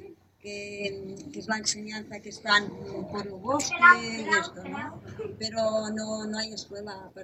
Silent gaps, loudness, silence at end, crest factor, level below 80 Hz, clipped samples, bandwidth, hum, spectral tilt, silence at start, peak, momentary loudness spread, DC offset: none; -27 LUFS; 0 s; 24 dB; -64 dBFS; under 0.1%; 15 kHz; none; -2.5 dB/octave; 0 s; -4 dBFS; 19 LU; under 0.1%